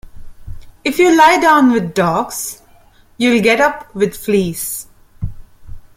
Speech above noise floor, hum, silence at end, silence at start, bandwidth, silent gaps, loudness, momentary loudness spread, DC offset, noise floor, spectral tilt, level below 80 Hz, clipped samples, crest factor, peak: 34 dB; none; 0.2 s; 0.15 s; 16.5 kHz; none; -13 LUFS; 17 LU; under 0.1%; -47 dBFS; -4.5 dB/octave; -38 dBFS; under 0.1%; 16 dB; 0 dBFS